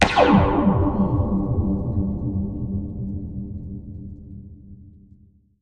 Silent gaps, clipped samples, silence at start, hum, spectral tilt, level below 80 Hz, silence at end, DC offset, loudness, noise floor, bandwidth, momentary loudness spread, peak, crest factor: none; under 0.1%; 0 s; none; -7 dB/octave; -34 dBFS; 0.65 s; 0.2%; -22 LUFS; -53 dBFS; 9.6 kHz; 22 LU; 0 dBFS; 22 dB